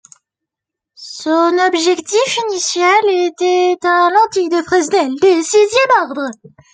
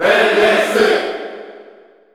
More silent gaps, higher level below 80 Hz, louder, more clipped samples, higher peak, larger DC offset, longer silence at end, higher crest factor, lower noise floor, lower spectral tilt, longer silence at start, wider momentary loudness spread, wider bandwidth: neither; second, -64 dBFS vs -56 dBFS; about the same, -13 LUFS vs -13 LUFS; neither; about the same, -2 dBFS vs -2 dBFS; neither; about the same, 0.4 s vs 0.5 s; about the same, 12 dB vs 14 dB; first, -83 dBFS vs -44 dBFS; about the same, -2 dB/octave vs -3 dB/octave; first, 1 s vs 0 s; second, 6 LU vs 18 LU; second, 9.4 kHz vs 15.5 kHz